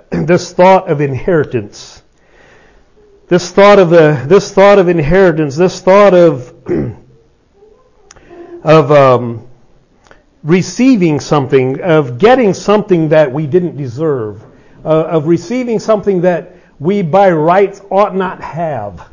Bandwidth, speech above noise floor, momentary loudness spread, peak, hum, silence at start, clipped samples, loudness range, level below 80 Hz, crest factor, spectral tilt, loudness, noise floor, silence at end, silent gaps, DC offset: 7.4 kHz; 38 dB; 13 LU; 0 dBFS; none; 0.1 s; 0.3%; 5 LU; -40 dBFS; 10 dB; -6.5 dB/octave; -10 LUFS; -47 dBFS; 0.1 s; none; under 0.1%